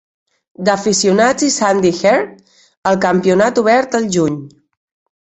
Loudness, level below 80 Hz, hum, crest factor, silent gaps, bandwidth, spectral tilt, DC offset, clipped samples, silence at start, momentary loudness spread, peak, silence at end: -14 LUFS; -54 dBFS; none; 14 dB; 2.77-2.82 s; 8.4 kHz; -4 dB/octave; under 0.1%; under 0.1%; 0.6 s; 7 LU; 0 dBFS; 0.7 s